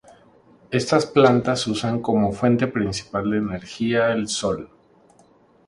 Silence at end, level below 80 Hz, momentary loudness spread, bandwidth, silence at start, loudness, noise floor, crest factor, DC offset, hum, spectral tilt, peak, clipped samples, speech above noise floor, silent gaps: 1 s; -52 dBFS; 10 LU; 11.5 kHz; 0.7 s; -21 LUFS; -55 dBFS; 22 dB; under 0.1%; none; -5.5 dB/octave; 0 dBFS; under 0.1%; 35 dB; none